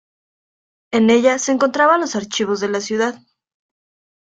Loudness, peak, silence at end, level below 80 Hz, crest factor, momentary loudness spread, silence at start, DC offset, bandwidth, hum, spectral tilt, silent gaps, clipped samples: -17 LUFS; -2 dBFS; 1.1 s; -64 dBFS; 18 dB; 8 LU; 0.9 s; under 0.1%; 9 kHz; none; -3.5 dB/octave; none; under 0.1%